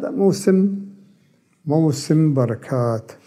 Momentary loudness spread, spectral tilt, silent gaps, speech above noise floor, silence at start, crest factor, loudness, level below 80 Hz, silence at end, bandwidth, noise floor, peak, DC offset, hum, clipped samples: 11 LU; -7.5 dB/octave; none; 40 dB; 0 s; 16 dB; -19 LUFS; -68 dBFS; 0.1 s; 14.5 kHz; -58 dBFS; -4 dBFS; under 0.1%; none; under 0.1%